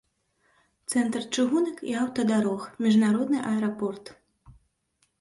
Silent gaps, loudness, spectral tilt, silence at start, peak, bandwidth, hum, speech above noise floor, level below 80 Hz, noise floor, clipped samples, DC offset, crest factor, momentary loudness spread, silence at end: none; -26 LUFS; -5 dB/octave; 0.9 s; -12 dBFS; 11.5 kHz; none; 47 dB; -66 dBFS; -72 dBFS; under 0.1%; under 0.1%; 14 dB; 9 LU; 0.7 s